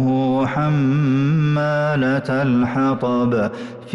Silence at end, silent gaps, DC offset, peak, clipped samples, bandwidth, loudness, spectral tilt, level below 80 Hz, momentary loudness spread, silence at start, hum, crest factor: 0 s; none; under 0.1%; -10 dBFS; under 0.1%; 7.2 kHz; -18 LUFS; -8.5 dB/octave; -52 dBFS; 2 LU; 0 s; none; 8 dB